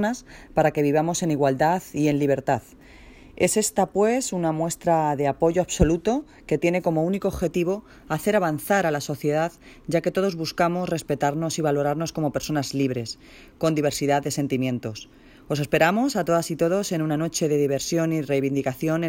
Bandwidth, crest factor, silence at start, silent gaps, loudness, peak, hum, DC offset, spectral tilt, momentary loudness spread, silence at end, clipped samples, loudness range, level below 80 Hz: 16.5 kHz; 20 dB; 0 s; none; -24 LUFS; -4 dBFS; none; under 0.1%; -5.5 dB/octave; 6 LU; 0 s; under 0.1%; 2 LU; -46 dBFS